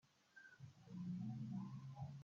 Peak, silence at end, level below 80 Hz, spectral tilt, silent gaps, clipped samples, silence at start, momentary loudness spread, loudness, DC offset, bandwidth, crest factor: -38 dBFS; 0 s; -82 dBFS; -8 dB/octave; none; under 0.1%; 0.05 s; 16 LU; -52 LUFS; under 0.1%; 7.4 kHz; 12 dB